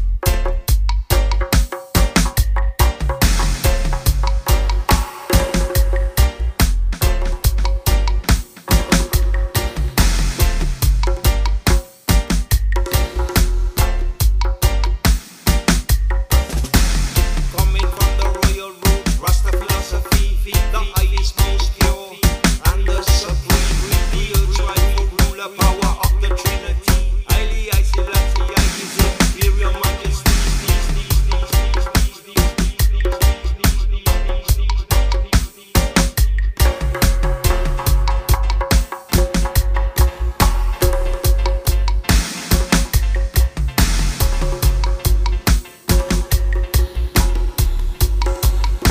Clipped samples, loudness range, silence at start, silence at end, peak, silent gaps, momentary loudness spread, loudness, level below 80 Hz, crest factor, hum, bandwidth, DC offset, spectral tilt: under 0.1%; 1 LU; 0 s; 0 s; 0 dBFS; none; 3 LU; -18 LUFS; -16 dBFS; 16 dB; none; 16.5 kHz; under 0.1%; -4.5 dB/octave